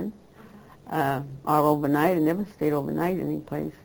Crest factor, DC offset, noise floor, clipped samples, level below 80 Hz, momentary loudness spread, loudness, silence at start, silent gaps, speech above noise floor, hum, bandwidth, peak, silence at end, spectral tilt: 18 dB; under 0.1%; -49 dBFS; under 0.1%; -58 dBFS; 9 LU; -25 LUFS; 0 s; none; 24 dB; none; over 20 kHz; -8 dBFS; 0.15 s; -7.5 dB/octave